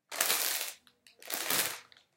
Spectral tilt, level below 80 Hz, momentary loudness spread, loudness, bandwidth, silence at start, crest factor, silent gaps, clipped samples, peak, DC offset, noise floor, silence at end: 1 dB/octave; -84 dBFS; 11 LU; -31 LUFS; 17 kHz; 0.1 s; 32 dB; none; under 0.1%; -4 dBFS; under 0.1%; -60 dBFS; 0.35 s